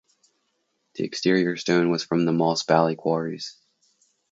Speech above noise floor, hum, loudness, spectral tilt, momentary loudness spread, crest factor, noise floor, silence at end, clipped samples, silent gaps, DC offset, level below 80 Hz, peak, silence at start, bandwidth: 51 dB; none; -23 LUFS; -5.5 dB/octave; 12 LU; 22 dB; -73 dBFS; 0.8 s; under 0.1%; none; under 0.1%; -70 dBFS; -4 dBFS; 0.95 s; 8 kHz